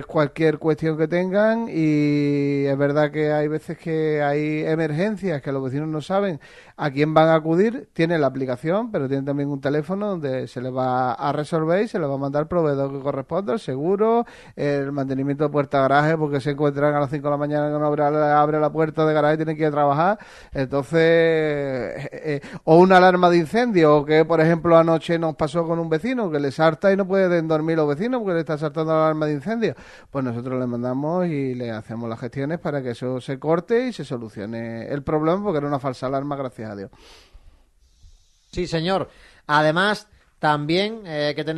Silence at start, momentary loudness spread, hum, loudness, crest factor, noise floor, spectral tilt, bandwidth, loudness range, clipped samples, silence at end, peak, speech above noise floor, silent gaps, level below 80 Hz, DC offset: 0 s; 11 LU; none; -21 LUFS; 20 dB; -56 dBFS; -7.5 dB/octave; 11.5 kHz; 9 LU; under 0.1%; 0 s; 0 dBFS; 35 dB; none; -54 dBFS; under 0.1%